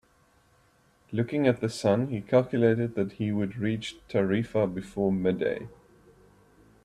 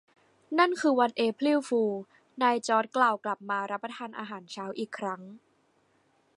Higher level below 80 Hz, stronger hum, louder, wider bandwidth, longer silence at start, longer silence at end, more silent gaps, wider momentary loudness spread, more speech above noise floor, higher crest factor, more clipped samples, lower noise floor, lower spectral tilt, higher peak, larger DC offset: first, -60 dBFS vs -84 dBFS; neither; about the same, -28 LUFS vs -28 LUFS; about the same, 12.5 kHz vs 11.5 kHz; first, 1.1 s vs 0.5 s; first, 1.15 s vs 1 s; neither; second, 7 LU vs 14 LU; about the same, 37 dB vs 40 dB; about the same, 20 dB vs 20 dB; neither; second, -64 dBFS vs -69 dBFS; first, -7 dB/octave vs -4.5 dB/octave; about the same, -10 dBFS vs -10 dBFS; neither